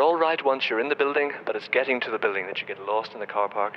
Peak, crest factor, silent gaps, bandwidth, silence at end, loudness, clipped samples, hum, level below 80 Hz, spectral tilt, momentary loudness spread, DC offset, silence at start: -6 dBFS; 18 dB; none; 6.4 kHz; 0 s; -25 LUFS; under 0.1%; none; -80 dBFS; -5 dB/octave; 7 LU; under 0.1%; 0 s